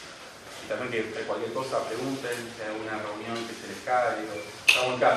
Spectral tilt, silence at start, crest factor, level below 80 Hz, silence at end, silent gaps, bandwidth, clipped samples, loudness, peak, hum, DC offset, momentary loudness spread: -3 dB/octave; 0 s; 28 dB; -66 dBFS; 0 s; none; 13.5 kHz; under 0.1%; -29 LUFS; 0 dBFS; none; under 0.1%; 15 LU